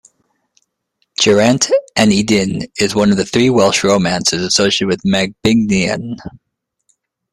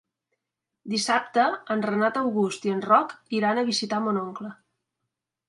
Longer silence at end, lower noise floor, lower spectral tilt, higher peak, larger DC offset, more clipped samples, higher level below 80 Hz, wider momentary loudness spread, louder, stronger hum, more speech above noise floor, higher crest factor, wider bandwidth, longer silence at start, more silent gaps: about the same, 1.05 s vs 0.95 s; second, -67 dBFS vs -85 dBFS; about the same, -4 dB/octave vs -4 dB/octave; first, 0 dBFS vs -6 dBFS; neither; neither; first, -46 dBFS vs -76 dBFS; about the same, 7 LU vs 8 LU; first, -13 LUFS vs -25 LUFS; neither; second, 53 dB vs 60 dB; second, 14 dB vs 20 dB; first, 14 kHz vs 11.5 kHz; first, 1.2 s vs 0.85 s; neither